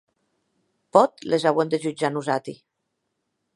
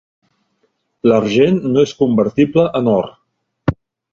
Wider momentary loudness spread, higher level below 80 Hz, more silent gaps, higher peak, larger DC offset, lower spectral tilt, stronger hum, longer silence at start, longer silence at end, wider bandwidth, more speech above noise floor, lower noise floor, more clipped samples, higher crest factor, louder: about the same, 8 LU vs 9 LU; second, -74 dBFS vs -46 dBFS; neither; about the same, -2 dBFS vs 0 dBFS; neither; second, -5.5 dB/octave vs -7.5 dB/octave; neither; about the same, 0.95 s vs 1.05 s; first, 1 s vs 0.4 s; first, 11.5 kHz vs 7.4 kHz; first, 56 dB vs 52 dB; first, -78 dBFS vs -65 dBFS; neither; first, 24 dB vs 16 dB; second, -22 LUFS vs -15 LUFS